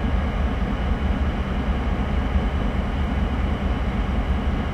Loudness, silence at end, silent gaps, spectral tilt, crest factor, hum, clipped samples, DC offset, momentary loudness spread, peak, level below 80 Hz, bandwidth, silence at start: -25 LUFS; 0 s; none; -8 dB/octave; 12 dB; none; under 0.1%; under 0.1%; 1 LU; -10 dBFS; -24 dBFS; 7.6 kHz; 0 s